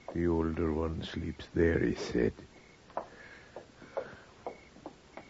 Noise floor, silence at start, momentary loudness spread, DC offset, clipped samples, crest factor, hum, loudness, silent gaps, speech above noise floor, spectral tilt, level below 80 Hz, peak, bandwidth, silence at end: -53 dBFS; 0.1 s; 21 LU; under 0.1%; under 0.1%; 20 dB; none; -33 LUFS; none; 21 dB; -7 dB/octave; -48 dBFS; -16 dBFS; 8 kHz; 0.05 s